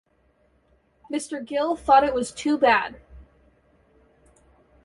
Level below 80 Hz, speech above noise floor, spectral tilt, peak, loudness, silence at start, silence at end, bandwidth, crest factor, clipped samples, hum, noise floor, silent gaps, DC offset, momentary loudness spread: -54 dBFS; 42 dB; -3.5 dB/octave; -6 dBFS; -22 LUFS; 1.1 s; 1.6 s; 11.5 kHz; 20 dB; under 0.1%; none; -64 dBFS; none; under 0.1%; 13 LU